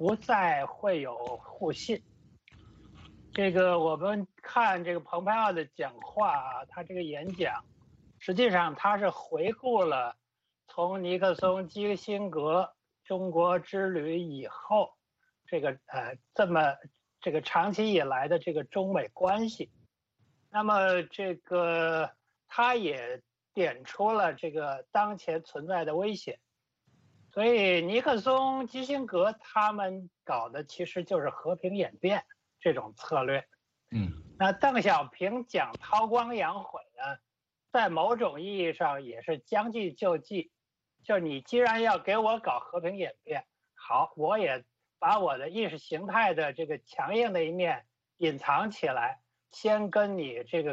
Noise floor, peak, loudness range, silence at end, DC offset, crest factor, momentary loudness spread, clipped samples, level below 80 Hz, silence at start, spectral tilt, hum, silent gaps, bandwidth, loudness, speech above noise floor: -85 dBFS; -12 dBFS; 3 LU; 0 s; under 0.1%; 18 dB; 11 LU; under 0.1%; -68 dBFS; 0 s; -6 dB/octave; none; none; 7.8 kHz; -30 LUFS; 56 dB